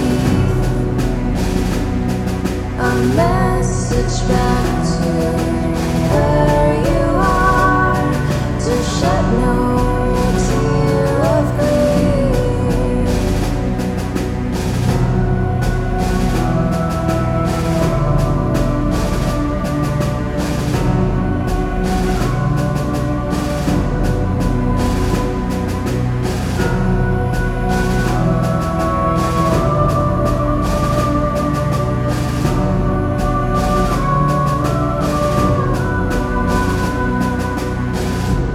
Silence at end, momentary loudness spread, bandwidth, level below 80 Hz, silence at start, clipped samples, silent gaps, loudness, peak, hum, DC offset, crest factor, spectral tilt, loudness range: 0 s; 5 LU; 15.5 kHz; -22 dBFS; 0 s; under 0.1%; none; -17 LUFS; 0 dBFS; none; under 0.1%; 14 dB; -6.5 dB/octave; 3 LU